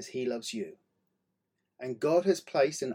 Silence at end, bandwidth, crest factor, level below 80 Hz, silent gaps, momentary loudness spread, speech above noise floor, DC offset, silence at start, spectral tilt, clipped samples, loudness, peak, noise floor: 0 s; 16 kHz; 18 dB; -82 dBFS; none; 14 LU; 52 dB; under 0.1%; 0 s; -4.5 dB/octave; under 0.1%; -30 LUFS; -14 dBFS; -82 dBFS